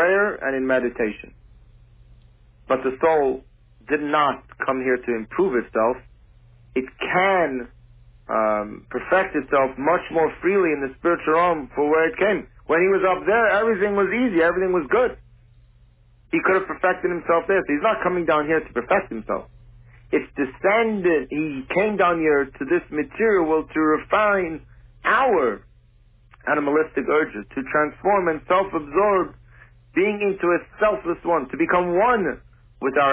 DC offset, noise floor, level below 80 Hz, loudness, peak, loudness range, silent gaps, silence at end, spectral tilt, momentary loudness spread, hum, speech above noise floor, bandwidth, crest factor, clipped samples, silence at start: under 0.1%; -54 dBFS; -50 dBFS; -21 LUFS; -6 dBFS; 4 LU; none; 0 s; -9.5 dB/octave; 8 LU; none; 33 dB; 4 kHz; 16 dB; under 0.1%; 0 s